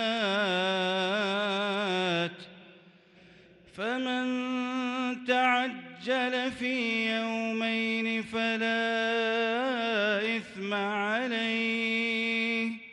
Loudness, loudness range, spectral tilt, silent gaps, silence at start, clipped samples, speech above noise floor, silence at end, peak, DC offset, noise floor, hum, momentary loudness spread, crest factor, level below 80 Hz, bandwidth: -29 LUFS; 4 LU; -4.5 dB/octave; none; 0 s; under 0.1%; 28 dB; 0 s; -14 dBFS; under 0.1%; -57 dBFS; none; 4 LU; 16 dB; -74 dBFS; 10.5 kHz